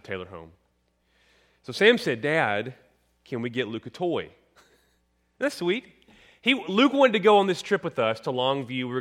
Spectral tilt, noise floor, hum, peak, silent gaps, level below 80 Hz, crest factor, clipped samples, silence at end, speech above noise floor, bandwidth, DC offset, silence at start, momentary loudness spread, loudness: -5 dB/octave; -70 dBFS; none; -6 dBFS; none; -68 dBFS; 20 dB; under 0.1%; 0 s; 45 dB; 15.5 kHz; under 0.1%; 0.1 s; 17 LU; -24 LUFS